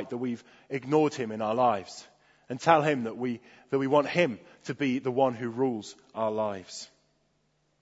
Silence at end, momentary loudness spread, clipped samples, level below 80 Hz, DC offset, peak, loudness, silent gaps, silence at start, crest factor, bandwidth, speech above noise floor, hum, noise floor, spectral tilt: 0.95 s; 17 LU; under 0.1%; -74 dBFS; under 0.1%; -4 dBFS; -28 LUFS; none; 0 s; 24 dB; 8 kHz; 44 dB; none; -72 dBFS; -6 dB/octave